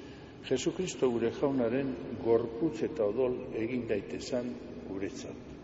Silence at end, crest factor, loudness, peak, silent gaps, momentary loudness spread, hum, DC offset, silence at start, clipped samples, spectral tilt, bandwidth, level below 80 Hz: 0 s; 18 dB; -33 LUFS; -14 dBFS; none; 12 LU; none; under 0.1%; 0 s; under 0.1%; -5.5 dB/octave; 8 kHz; -58 dBFS